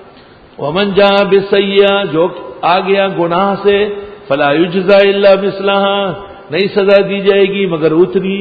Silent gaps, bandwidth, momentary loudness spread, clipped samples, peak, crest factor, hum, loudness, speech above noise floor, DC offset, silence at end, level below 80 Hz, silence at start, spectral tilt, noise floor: none; 5 kHz; 9 LU; under 0.1%; 0 dBFS; 12 dB; none; -11 LUFS; 28 dB; under 0.1%; 0 s; -48 dBFS; 0 s; -8 dB/octave; -39 dBFS